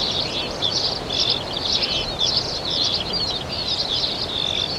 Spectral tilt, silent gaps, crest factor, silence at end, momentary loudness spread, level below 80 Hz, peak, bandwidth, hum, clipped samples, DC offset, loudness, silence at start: -2.5 dB/octave; none; 18 dB; 0 s; 3 LU; -42 dBFS; -6 dBFS; 16.5 kHz; none; under 0.1%; under 0.1%; -20 LUFS; 0 s